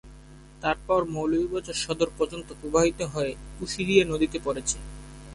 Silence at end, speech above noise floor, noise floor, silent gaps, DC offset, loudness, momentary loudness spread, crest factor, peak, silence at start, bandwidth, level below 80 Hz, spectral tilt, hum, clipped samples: 0 s; 21 dB; -48 dBFS; none; under 0.1%; -27 LUFS; 12 LU; 22 dB; -6 dBFS; 0.05 s; 11.5 kHz; -46 dBFS; -4 dB/octave; none; under 0.1%